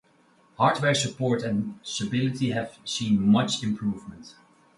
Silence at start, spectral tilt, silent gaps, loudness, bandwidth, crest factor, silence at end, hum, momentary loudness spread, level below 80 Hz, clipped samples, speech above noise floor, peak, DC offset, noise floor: 0.6 s; -5 dB/octave; none; -25 LUFS; 11.5 kHz; 20 dB; 0.45 s; none; 10 LU; -60 dBFS; under 0.1%; 35 dB; -6 dBFS; under 0.1%; -61 dBFS